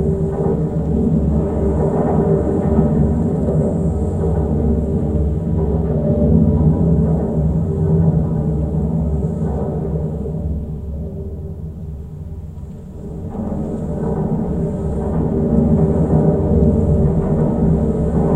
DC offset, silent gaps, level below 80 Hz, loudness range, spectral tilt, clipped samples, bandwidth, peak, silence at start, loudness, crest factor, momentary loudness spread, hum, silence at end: under 0.1%; none; -24 dBFS; 9 LU; -11.5 dB/octave; under 0.1%; 8.2 kHz; -2 dBFS; 0 s; -17 LUFS; 16 dB; 13 LU; none; 0 s